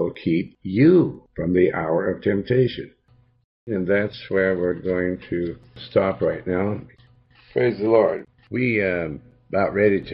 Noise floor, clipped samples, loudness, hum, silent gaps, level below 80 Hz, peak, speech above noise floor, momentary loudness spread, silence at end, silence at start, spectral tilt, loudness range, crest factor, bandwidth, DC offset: -54 dBFS; under 0.1%; -22 LUFS; none; 3.44-3.67 s; -54 dBFS; -4 dBFS; 33 dB; 11 LU; 0 s; 0 s; -11 dB/octave; 3 LU; 18 dB; 5.6 kHz; under 0.1%